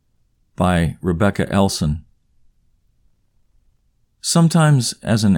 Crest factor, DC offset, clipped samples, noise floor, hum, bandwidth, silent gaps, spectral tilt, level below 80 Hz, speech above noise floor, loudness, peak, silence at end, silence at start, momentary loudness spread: 16 dB; under 0.1%; under 0.1%; -62 dBFS; none; 17.5 kHz; none; -5.5 dB/octave; -40 dBFS; 46 dB; -18 LUFS; -2 dBFS; 0 s; 0.6 s; 9 LU